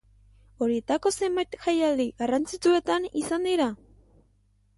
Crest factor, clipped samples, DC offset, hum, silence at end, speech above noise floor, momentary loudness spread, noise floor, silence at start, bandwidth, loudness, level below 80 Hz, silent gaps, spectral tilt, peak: 16 dB; under 0.1%; under 0.1%; 50 Hz at -55 dBFS; 1 s; 39 dB; 5 LU; -65 dBFS; 0.6 s; 11.5 kHz; -26 LUFS; -58 dBFS; none; -3.5 dB/octave; -12 dBFS